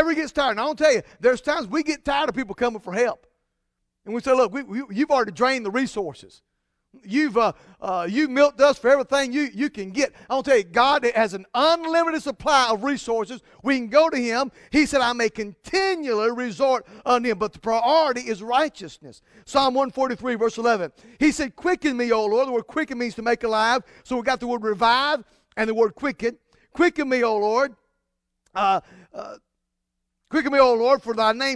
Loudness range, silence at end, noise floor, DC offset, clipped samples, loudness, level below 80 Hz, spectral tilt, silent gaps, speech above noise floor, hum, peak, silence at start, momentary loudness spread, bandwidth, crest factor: 4 LU; 0 s; -79 dBFS; under 0.1%; under 0.1%; -22 LUFS; -54 dBFS; -3.5 dB/octave; none; 57 dB; none; -2 dBFS; 0 s; 9 LU; 11 kHz; 20 dB